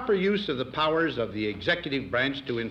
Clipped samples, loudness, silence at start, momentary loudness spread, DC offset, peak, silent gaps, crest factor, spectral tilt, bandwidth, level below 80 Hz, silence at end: under 0.1%; -27 LUFS; 0 s; 5 LU; under 0.1%; -14 dBFS; none; 14 dB; -6.5 dB/octave; 8 kHz; -54 dBFS; 0 s